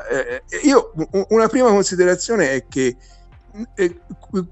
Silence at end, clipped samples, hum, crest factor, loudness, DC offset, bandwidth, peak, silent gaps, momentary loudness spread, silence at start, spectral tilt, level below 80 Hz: 0 s; under 0.1%; none; 18 dB; -18 LUFS; under 0.1%; 8.4 kHz; 0 dBFS; none; 11 LU; 0 s; -4.5 dB/octave; -46 dBFS